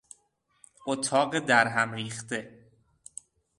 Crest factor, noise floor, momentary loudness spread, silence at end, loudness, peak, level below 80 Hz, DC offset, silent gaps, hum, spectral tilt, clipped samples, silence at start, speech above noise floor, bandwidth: 24 dB; -71 dBFS; 22 LU; 1.1 s; -27 LUFS; -6 dBFS; -70 dBFS; under 0.1%; none; none; -3.5 dB/octave; under 0.1%; 0.85 s; 44 dB; 11.5 kHz